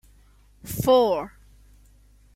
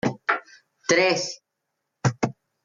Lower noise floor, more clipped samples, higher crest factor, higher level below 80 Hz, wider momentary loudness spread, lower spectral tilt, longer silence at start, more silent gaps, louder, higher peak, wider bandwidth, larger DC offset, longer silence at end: second, -55 dBFS vs -80 dBFS; neither; about the same, 18 dB vs 20 dB; first, -50 dBFS vs -64 dBFS; first, 22 LU vs 13 LU; first, -5.5 dB/octave vs -4 dB/octave; first, 0.65 s vs 0.05 s; neither; about the same, -22 LUFS vs -24 LUFS; about the same, -8 dBFS vs -6 dBFS; first, 16.5 kHz vs 9.6 kHz; neither; first, 1.05 s vs 0.35 s